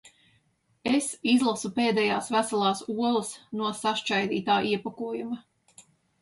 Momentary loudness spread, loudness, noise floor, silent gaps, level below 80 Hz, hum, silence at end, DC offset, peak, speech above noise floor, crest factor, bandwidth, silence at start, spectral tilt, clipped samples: 10 LU; -27 LUFS; -69 dBFS; none; -70 dBFS; none; 0.4 s; under 0.1%; -10 dBFS; 42 dB; 18 dB; 11.5 kHz; 0.05 s; -4 dB/octave; under 0.1%